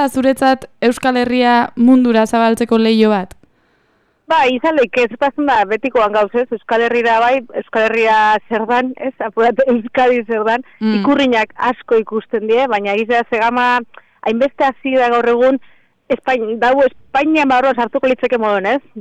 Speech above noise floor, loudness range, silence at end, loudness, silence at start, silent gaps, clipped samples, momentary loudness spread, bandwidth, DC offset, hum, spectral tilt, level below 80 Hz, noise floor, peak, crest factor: 45 dB; 2 LU; 0 s; -14 LUFS; 0 s; none; under 0.1%; 6 LU; 14 kHz; under 0.1%; none; -5 dB/octave; -52 dBFS; -59 dBFS; 0 dBFS; 14 dB